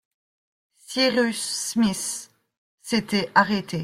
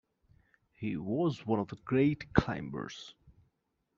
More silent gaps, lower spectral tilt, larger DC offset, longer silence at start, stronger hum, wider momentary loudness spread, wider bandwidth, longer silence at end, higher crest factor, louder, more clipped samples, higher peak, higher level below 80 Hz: first, 2.58-2.78 s vs none; second, -3.5 dB/octave vs -6.5 dB/octave; neither; about the same, 0.9 s vs 0.8 s; neither; second, 10 LU vs 13 LU; first, 15.5 kHz vs 7.4 kHz; second, 0 s vs 0.85 s; about the same, 22 dB vs 26 dB; first, -23 LUFS vs -33 LUFS; neither; first, -4 dBFS vs -8 dBFS; second, -62 dBFS vs -54 dBFS